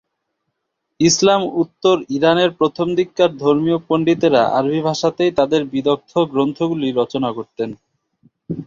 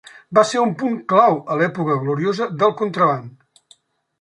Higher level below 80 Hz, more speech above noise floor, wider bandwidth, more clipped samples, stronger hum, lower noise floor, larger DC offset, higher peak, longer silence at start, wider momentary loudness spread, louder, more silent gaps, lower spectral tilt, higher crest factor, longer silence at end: first, -56 dBFS vs -66 dBFS; first, 59 dB vs 37 dB; second, 7.6 kHz vs 11 kHz; neither; neither; first, -75 dBFS vs -55 dBFS; neither; about the same, -2 dBFS vs -2 dBFS; first, 1 s vs 0.15 s; about the same, 7 LU vs 6 LU; about the same, -17 LUFS vs -18 LUFS; neither; about the same, -5 dB/octave vs -6 dB/octave; about the same, 16 dB vs 18 dB; second, 0 s vs 0.9 s